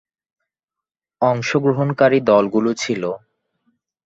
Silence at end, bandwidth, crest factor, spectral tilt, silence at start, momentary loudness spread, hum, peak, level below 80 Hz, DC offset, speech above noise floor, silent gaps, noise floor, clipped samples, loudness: 0.9 s; 8 kHz; 18 dB; -6 dB/octave; 1.2 s; 9 LU; none; -2 dBFS; -62 dBFS; under 0.1%; 71 dB; none; -87 dBFS; under 0.1%; -18 LUFS